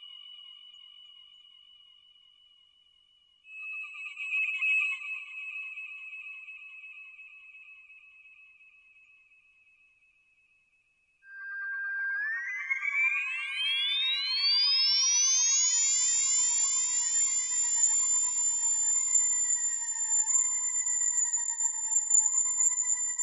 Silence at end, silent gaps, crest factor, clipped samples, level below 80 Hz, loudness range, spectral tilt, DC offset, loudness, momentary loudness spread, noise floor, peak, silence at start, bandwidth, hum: 0 s; none; 18 dB; under 0.1%; -88 dBFS; 19 LU; 9.5 dB/octave; under 0.1%; -25 LUFS; 20 LU; -71 dBFS; -12 dBFS; 0 s; 11.5 kHz; none